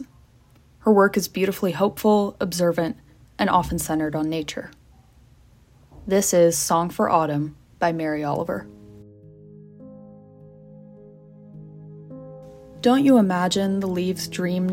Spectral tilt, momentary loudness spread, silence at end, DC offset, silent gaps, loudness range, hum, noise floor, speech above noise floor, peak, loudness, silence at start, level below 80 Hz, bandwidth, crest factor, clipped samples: -5 dB/octave; 25 LU; 0 s; under 0.1%; none; 10 LU; none; -54 dBFS; 33 dB; -4 dBFS; -22 LUFS; 0 s; -52 dBFS; 16.5 kHz; 20 dB; under 0.1%